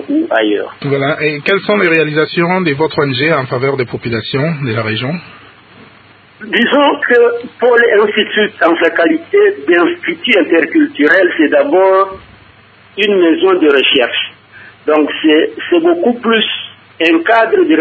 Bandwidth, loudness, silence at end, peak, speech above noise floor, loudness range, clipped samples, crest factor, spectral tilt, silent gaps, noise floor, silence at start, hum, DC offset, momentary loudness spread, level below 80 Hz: 8 kHz; -11 LUFS; 0 s; 0 dBFS; 31 dB; 5 LU; under 0.1%; 12 dB; -7.5 dB/octave; none; -42 dBFS; 0 s; none; under 0.1%; 8 LU; -54 dBFS